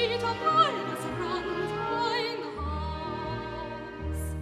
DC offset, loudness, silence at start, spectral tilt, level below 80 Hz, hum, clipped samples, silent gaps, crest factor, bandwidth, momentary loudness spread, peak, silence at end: under 0.1%; -30 LUFS; 0 s; -5 dB/octave; -42 dBFS; none; under 0.1%; none; 20 dB; 14.5 kHz; 12 LU; -10 dBFS; 0 s